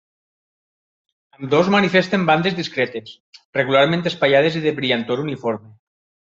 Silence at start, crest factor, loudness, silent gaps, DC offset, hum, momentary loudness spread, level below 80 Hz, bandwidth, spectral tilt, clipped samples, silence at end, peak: 1.4 s; 18 dB; -18 LUFS; 3.20-3.32 s, 3.45-3.53 s; under 0.1%; none; 10 LU; -62 dBFS; 7.6 kHz; -6 dB/octave; under 0.1%; 0.75 s; -2 dBFS